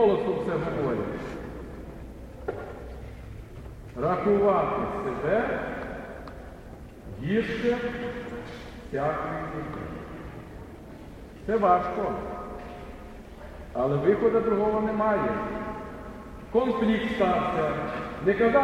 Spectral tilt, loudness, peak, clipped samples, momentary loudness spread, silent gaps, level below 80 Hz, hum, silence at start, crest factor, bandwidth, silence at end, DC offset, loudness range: -7.5 dB/octave; -27 LUFS; -8 dBFS; under 0.1%; 20 LU; none; -46 dBFS; none; 0 s; 20 dB; 13.5 kHz; 0 s; under 0.1%; 7 LU